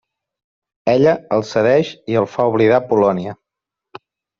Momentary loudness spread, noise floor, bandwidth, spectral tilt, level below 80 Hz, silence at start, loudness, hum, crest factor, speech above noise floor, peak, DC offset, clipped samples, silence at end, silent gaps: 7 LU; -84 dBFS; 7.2 kHz; -7 dB/octave; -58 dBFS; 0.85 s; -16 LUFS; none; 16 dB; 69 dB; -2 dBFS; under 0.1%; under 0.1%; 1.05 s; none